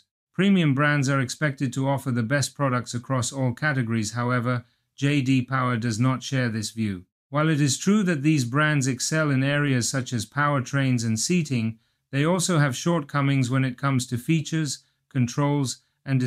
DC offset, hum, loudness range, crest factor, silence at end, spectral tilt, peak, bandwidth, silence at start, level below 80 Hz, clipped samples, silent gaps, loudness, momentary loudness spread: under 0.1%; none; 3 LU; 14 dB; 0 s; -5 dB/octave; -10 dBFS; 14.5 kHz; 0.4 s; -64 dBFS; under 0.1%; 7.12-7.30 s; -24 LUFS; 7 LU